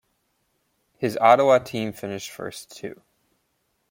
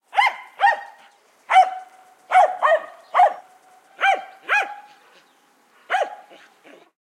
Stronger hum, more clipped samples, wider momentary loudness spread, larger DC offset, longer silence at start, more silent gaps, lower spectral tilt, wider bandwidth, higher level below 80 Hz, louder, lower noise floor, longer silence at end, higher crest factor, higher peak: neither; neither; first, 20 LU vs 13 LU; neither; first, 1 s vs 0.15 s; neither; first, -5 dB/octave vs 1 dB/octave; first, 17 kHz vs 12 kHz; first, -66 dBFS vs under -90 dBFS; about the same, -21 LUFS vs -20 LUFS; first, -72 dBFS vs -58 dBFS; about the same, 1 s vs 0.95 s; about the same, 22 dB vs 18 dB; about the same, -4 dBFS vs -4 dBFS